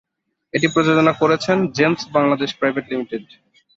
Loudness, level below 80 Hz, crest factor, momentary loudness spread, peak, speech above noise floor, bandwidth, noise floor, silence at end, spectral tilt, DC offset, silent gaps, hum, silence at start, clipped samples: -18 LUFS; -60 dBFS; 16 dB; 10 LU; -2 dBFS; 34 dB; 7.8 kHz; -52 dBFS; 0.55 s; -5.5 dB/octave; under 0.1%; none; none; 0.55 s; under 0.1%